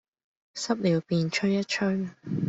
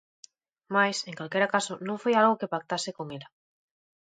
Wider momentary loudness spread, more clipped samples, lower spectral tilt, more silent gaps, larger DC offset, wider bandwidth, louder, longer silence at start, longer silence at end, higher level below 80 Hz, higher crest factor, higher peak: second, 8 LU vs 13 LU; neither; first, -5.5 dB/octave vs -4 dB/octave; neither; neither; second, 8 kHz vs 9.6 kHz; about the same, -27 LUFS vs -27 LUFS; second, 0.55 s vs 0.7 s; second, 0 s vs 0.95 s; first, -66 dBFS vs -78 dBFS; about the same, 16 dB vs 20 dB; second, -12 dBFS vs -8 dBFS